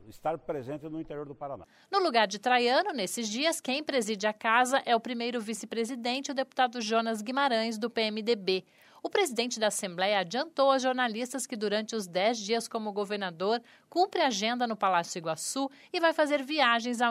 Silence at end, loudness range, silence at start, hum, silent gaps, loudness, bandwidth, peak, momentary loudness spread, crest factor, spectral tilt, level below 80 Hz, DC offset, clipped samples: 0 s; 2 LU; 0 s; none; none; -29 LUFS; 16 kHz; -10 dBFS; 10 LU; 20 dB; -3 dB/octave; -74 dBFS; under 0.1%; under 0.1%